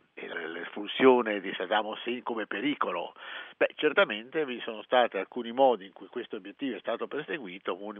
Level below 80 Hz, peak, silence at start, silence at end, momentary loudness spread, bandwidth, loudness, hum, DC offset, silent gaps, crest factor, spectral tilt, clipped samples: -86 dBFS; -8 dBFS; 0.15 s; 0 s; 14 LU; 3.9 kHz; -30 LUFS; none; under 0.1%; none; 22 dB; -1.5 dB/octave; under 0.1%